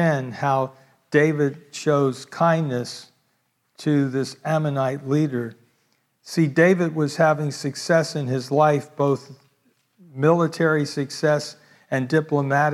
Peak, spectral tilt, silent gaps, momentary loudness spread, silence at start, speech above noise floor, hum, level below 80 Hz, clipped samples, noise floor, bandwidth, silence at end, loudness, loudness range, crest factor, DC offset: -4 dBFS; -6.5 dB/octave; none; 9 LU; 0 s; 48 dB; none; -74 dBFS; under 0.1%; -69 dBFS; 13 kHz; 0 s; -22 LUFS; 4 LU; 18 dB; under 0.1%